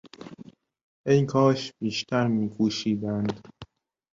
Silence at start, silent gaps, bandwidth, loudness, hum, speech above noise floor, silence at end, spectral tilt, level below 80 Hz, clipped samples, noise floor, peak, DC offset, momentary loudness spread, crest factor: 0.05 s; 0.83-1.04 s; 7.6 kHz; -25 LUFS; none; 27 dB; 0.5 s; -6.5 dB/octave; -62 dBFS; under 0.1%; -51 dBFS; -8 dBFS; under 0.1%; 18 LU; 18 dB